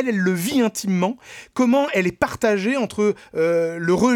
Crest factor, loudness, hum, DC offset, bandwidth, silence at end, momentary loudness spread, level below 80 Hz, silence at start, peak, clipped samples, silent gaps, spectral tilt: 16 dB; -21 LUFS; none; under 0.1%; 18 kHz; 0 s; 4 LU; -54 dBFS; 0 s; -4 dBFS; under 0.1%; none; -5.5 dB/octave